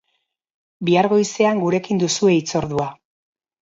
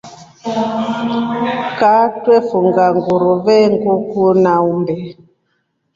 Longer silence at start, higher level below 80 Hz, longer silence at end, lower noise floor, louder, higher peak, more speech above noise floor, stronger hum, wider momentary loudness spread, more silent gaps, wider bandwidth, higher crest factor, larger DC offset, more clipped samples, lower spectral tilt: first, 0.8 s vs 0.05 s; about the same, -56 dBFS vs -56 dBFS; about the same, 0.7 s vs 0.8 s; first, -72 dBFS vs -66 dBFS; second, -19 LUFS vs -14 LUFS; about the same, -4 dBFS vs -2 dBFS; about the same, 54 dB vs 52 dB; neither; about the same, 9 LU vs 8 LU; neither; about the same, 7.8 kHz vs 7.6 kHz; about the same, 16 dB vs 12 dB; neither; neither; second, -5 dB/octave vs -7 dB/octave